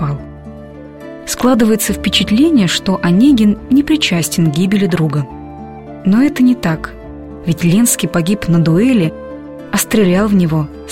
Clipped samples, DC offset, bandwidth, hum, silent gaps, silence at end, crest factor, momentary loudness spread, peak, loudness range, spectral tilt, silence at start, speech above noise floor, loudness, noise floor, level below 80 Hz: under 0.1%; 0.3%; 16.5 kHz; none; none; 0 s; 14 dB; 20 LU; 0 dBFS; 3 LU; -5 dB/octave; 0 s; 20 dB; -13 LUFS; -32 dBFS; -36 dBFS